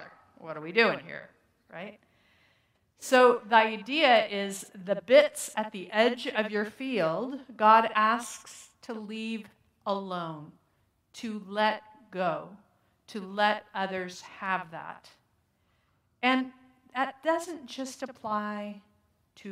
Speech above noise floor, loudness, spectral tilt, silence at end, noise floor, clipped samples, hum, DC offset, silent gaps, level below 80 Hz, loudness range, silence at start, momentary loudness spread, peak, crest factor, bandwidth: 43 dB; -28 LUFS; -3.5 dB/octave; 0 s; -72 dBFS; under 0.1%; none; under 0.1%; none; -80 dBFS; 10 LU; 0 s; 21 LU; -6 dBFS; 24 dB; 16 kHz